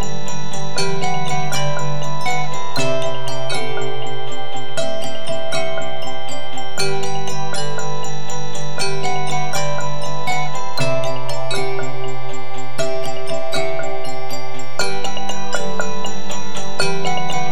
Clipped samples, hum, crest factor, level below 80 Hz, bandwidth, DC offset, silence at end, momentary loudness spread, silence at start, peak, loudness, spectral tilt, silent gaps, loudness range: under 0.1%; none; 20 dB; -54 dBFS; 19 kHz; 30%; 0 s; 7 LU; 0 s; -2 dBFS; -24 LUFS; -4 dB/octave; none; 3 LU